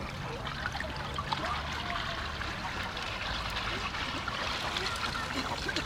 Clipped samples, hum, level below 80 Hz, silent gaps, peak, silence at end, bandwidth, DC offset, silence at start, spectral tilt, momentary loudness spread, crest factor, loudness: under 0.1%; none; -46 dBFS; none; -16 dBFS; 0 s; 16 kHz; under 0.1%; 0 s; -3.5 dB/octave; 4 LU; 20 dB; -34 LUFS